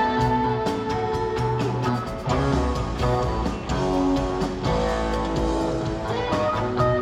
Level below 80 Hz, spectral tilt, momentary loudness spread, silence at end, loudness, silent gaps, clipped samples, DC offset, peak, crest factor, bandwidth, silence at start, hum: -32 dBFS; -6.5 dB/octave; 4 LU; 0 s; -24 LUFS; none; under 0.1%; under 0.1%; -8 dBFS; 14 dB; 12 kHz; 0 s; none